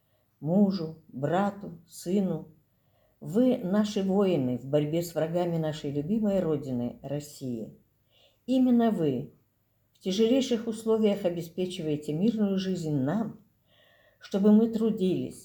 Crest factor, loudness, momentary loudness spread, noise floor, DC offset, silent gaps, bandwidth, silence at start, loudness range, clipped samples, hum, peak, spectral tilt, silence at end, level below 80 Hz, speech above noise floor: 16 dB; -28 LUFS; 13 LU; -71 dBFS; under 0.1%; none; 19.5 kHz; 0.4 s; 3 LU; under 0.1%; none; -12 dBFS; -7 dB/octave; 0 s; -64 dBFS; 44 dB